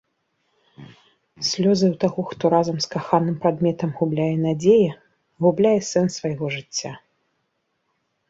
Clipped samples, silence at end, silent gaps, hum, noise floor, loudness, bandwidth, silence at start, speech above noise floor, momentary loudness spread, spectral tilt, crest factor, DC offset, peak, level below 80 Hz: under 0.1%; 1.35 s; none; none; -73 dBFS; -21 LUFS; 7.8 kHz; 0.8 s; 53 dB; 9 LU; -6 dB/octave; 18 dB; under 0.1%; -4 dBFS; -62 dBFS